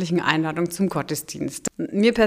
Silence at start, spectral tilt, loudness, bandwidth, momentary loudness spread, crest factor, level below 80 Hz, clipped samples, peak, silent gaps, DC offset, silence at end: 0 s; -5 dB/octave; -24 LUFS; 16 kHz; 8 LU; 22 dB; -54 dBFS; under 0.1%; 0 dBFS; none; under 0.1%; 0 s